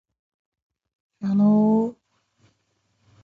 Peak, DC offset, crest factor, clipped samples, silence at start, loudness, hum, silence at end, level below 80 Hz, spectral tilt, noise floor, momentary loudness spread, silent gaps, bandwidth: -10 dBFS; under 0.1%; 14 dB; under 0.1%; 1.2 s; -21 LUFS; none; 1.3 s; -68 dBFS; -11 dB/octave; -70 dBFS; 13 LU; none; 4.7 kHz